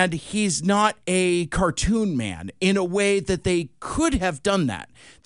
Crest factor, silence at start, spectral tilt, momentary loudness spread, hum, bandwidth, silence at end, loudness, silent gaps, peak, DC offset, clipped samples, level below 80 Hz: 18 dB; 0 s; -4.5 dB/octave; 6 LU; none; 11 kHz; 0.15 s; -23 LUFS; none; -4 dBFS; 0.1%; under 0.1%; -38 dBFS